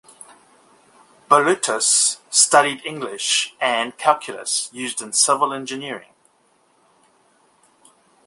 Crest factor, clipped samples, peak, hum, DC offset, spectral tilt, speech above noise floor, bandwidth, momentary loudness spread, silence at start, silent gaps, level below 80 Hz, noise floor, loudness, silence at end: 22 dB; under 0.1%; 0 dBFS; none; under 0.1%; -0.5 dB/octave; 41 dB; 12 kHz; 14 LU; 1.3 s; none; -72 dBFS; -61 dBFS; -18 LUFS; 2.3 s